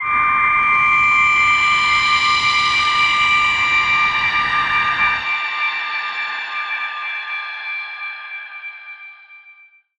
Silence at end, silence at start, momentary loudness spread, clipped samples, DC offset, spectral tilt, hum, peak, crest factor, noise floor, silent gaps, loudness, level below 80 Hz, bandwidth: 0.5 s; 0 s; 15 LU; under 0.1%; under 0.1%; -0.5 dB/octave; none; -4 dBFS; 14 dB; -47 dBFS; none; -15 LUFS; -48 dBFS; 10.5 kHz